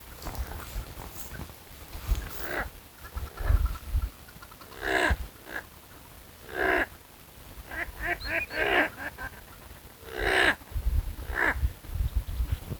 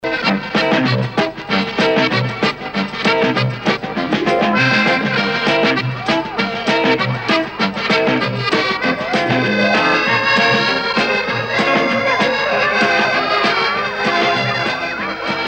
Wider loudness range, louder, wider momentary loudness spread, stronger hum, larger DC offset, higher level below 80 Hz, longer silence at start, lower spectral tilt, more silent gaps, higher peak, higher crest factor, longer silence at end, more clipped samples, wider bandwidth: first, 6 LU vs 2 LU; second, -31 LUFS vs -15 LUFS; first, 21 LU vs 6 LU; neither; neither; first, -36 dBFS vs -50 dBFS; about the same, 0 s vs 0.05 s; about the same, -4.5 dB/octave vs -5 dB/octave; neither; second, -8 dBFS vs -2 dBFS; first, 22 dB vs 14 dB; about the same, 0 s vs 0 s; neither; first, over 20 kHz vs 16 kHz